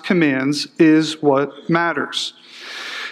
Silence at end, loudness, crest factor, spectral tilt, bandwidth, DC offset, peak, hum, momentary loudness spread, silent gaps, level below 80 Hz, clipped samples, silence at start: 0 s; -18 LUFS; 16 dB; -5 dB/octave; 12 kHz; under 0.1%; -2 dBFS; none; 14 LU; none; -72 dBFS; under 0.1%; 0.05 s